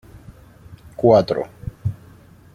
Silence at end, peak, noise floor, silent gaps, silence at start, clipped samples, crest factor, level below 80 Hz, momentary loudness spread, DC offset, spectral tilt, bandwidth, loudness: 0.6 s; 0 dBFS; -46 dBFS; none; 0.15 s; under 0.1%; 22 dB; -46 dBFS; 23 LU; under 0.1%; -8.5 dB/octave; 15 kHz; -19 LUFS